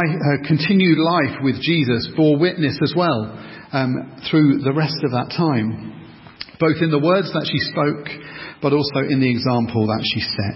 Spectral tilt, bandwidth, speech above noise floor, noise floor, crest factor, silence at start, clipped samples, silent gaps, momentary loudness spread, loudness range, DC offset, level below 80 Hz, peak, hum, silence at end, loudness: -10.5 dB/octave; 5.8 kHz; 20 dB; -38 dBFS; 16 dB; 0 s; under 0.1%; none; 10 LU; 3 LU; under 0.1%; -50 dBFS; -2 dBFS; none; 0 s; -19 LUFS